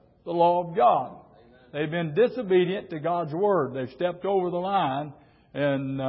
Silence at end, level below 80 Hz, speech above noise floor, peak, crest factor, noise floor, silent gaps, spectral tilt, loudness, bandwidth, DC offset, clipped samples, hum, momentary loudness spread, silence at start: 0 s; -64 dBFS; 29 dB; -10 dBFS; 16 dB; -54 dBFS; none; -11 dB/octave; -25 LUFS; 5.8 kHz; under 0.1%; under 0.1%; none; 10 LU; 0.25 s